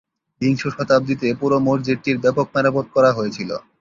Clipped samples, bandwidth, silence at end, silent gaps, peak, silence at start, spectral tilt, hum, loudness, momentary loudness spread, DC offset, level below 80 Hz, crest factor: under 0.1%; 7.4 kHz; 0.2 s; none; -2 dBFS; 0.4 s; -7 dB/octave; none; -19 LUFS; 7 LU; under 0.1%; -56 dBFS; 16 dB